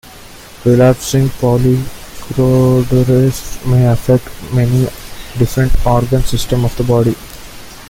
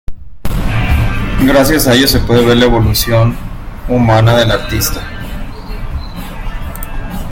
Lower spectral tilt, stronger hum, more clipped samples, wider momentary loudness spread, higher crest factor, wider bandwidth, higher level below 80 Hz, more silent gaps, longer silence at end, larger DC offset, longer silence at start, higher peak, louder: first, -7 dB/octave vs -5 dB/octave; neither; neither; about the same, 15 LU vs 17 LU; about the same, 12 dB vs 12 dB; about the same, 16.5 kHz vs 17 kHz; about the same, -24 dBFS vs -20 dBFS; neither; about the same, 0 s vs 0 s; neither; about the same, 0.1 s vs 0.1 s; about the same, 0 dBFS vs 0 dBFS; about the same, -13 LUFS vs -11 LUFS